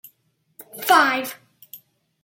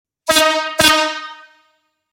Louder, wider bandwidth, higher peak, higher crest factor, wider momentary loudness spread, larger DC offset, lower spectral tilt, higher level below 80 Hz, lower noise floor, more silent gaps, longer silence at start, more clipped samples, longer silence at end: second, -18 LUFS vs -14 LUFS; about the same, 17 kHz vs 17 kHz; about the same, -2 dBFS vs 0 dBFS; about the same, 22 dB vs 18 dB; first, 25 LU vs 15 LU; neither; about the same, -1.5 dB/octave vs -1 dB/octave; second, -78 dBFS vs -50 dBFS; first, -67 dBFS vs -63 dBFS; neither; first, 0.75 s vs 0.25 s; neither; second, 0.45 s vs 0.75 s